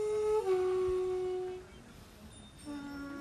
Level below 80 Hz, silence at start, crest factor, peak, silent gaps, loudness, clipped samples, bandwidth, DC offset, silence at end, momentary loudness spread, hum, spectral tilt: -58 dBFS; 0 s; 14 dB; -22 dBFS; none; -34 LUFS; under 0.1%; 12.5 kHz; under 0.1%; 0 s; 22 LU; none; -6 dB/octave